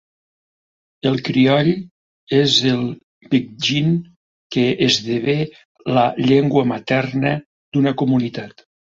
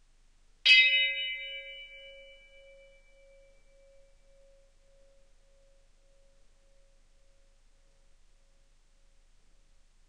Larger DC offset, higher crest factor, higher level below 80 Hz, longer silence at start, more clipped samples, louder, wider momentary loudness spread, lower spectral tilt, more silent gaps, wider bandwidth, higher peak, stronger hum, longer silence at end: neither; second, 18 dB vs 28 dB; first, -56 dBFS vs -62 dBFS; first, 1.05 s vs 0.65 s; neither; first, -18 LUFS vs -23 LUFS; second, 12 LU vs 29 LU; first, -5.5 dB/octave vs 2.5 dB/octave; first, 1.91-2.27 s, 3.03-3.21 s, 4.16-4.50 s, 5.65-5.75 s, 7.46-7.72 s vs none; second, 7.8 kHz vs 10 kHz; first, -2 dBFS vs -8 dBFS; neither; second, 0.5 s vs 8 s